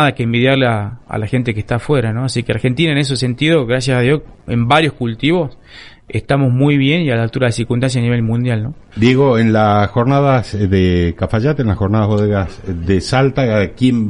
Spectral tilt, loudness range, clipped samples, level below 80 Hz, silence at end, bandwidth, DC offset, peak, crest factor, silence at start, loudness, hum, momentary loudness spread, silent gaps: -6.5 dB/octave; 2 LU; under 0.1%; -36 dBFS; 0 s; 11 kHz; under 0.1%; 0 dBFS; 14 dB; 0 s; -15 LUFS; none; 7 LU; none